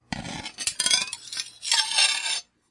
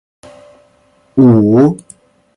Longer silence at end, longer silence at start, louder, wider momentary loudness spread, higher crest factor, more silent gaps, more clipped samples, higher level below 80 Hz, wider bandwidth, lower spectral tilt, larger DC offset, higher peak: second, 0.3 s vs 0.6 s; second, 0.1 s vs 1.15 s; second, -23 LUFS vs -10 LUFS; about the same, 13 LU vs 12 LU; first, 22 dB vs 12 dB; neither; neither; second, -58 dBFS vs -50 dBFS; about the same, 11.5 kHz vs 11 kHz; second, 0.5 dB/octave vs -10 dB/octave; neither; second, -4 dBFS vs 0 dBFS